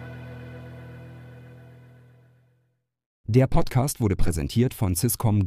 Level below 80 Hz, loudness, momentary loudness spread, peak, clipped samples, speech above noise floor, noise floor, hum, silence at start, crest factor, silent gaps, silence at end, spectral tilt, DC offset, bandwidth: -36 dBFS; -24 LUFS; 23 LU; -6 dBFS; under 0.1%; 50 dB; -72 dBFS; none; 0 s; 18 dB; 3.06-3.24 s; 0 s; -6 dB/octave; under 0.1%; 15.5 kHz